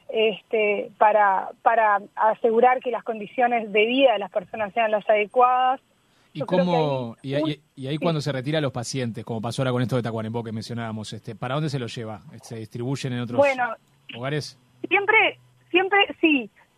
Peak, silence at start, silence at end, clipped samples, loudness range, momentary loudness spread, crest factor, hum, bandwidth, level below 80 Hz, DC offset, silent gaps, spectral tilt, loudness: -4 dBFS; 0.1 s; 0.3 s; under 0.1%; 7 LU; 15 LU; 20 dB; none; 13.5 kHz; -66 dBFS; under 0.1%; none; -5.5 dB/octave; -23 LUFS